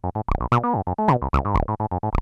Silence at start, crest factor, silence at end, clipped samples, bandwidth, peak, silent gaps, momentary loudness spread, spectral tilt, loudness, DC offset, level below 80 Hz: 0.05 s; 14 dB; 0 s; under 0.1%; 8.8 kHz; -6 dBFS; none; 5 LU; -9 dB/octave; -23 LUFS; under 0.1%; -30 dBFS